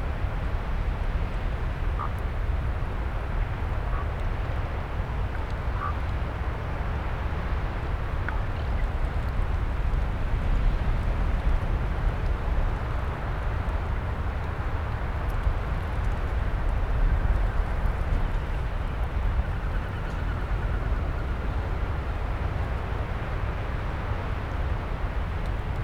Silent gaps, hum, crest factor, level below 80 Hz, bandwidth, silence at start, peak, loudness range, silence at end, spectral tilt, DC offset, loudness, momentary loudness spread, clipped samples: none; none; 14 dB; -28 dBFS; 6.8 kHz; 0 s; -12 dBFS; 2 LU; 0 s; -7.5 dB/octave; 0.6%; -30 LUFS; 3 LU; under 0.1%